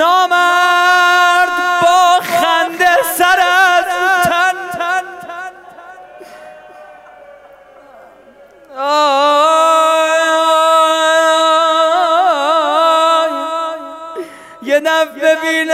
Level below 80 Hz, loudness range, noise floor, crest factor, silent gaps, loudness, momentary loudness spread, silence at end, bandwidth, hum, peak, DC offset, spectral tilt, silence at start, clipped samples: -58 dBFS; 9 LU; -42 dBFS; 12 dB; none; -11 LUFS; 15 LU; 0 s; 16 kHz; none; -2 dBFS; under 0.1%; -1.5 dB/octave; 0 s; under 0.1%